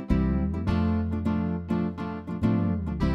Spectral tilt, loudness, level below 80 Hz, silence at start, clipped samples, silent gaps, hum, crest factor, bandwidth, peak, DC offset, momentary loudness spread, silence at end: -9.5 dB/octave; -27 LUFS; -36 dBFS; 0 s; under 0.1%; none; none; 16 dB; 6.4 kHz; -10 dBFS; under 0.1%; 4 LU; 0 s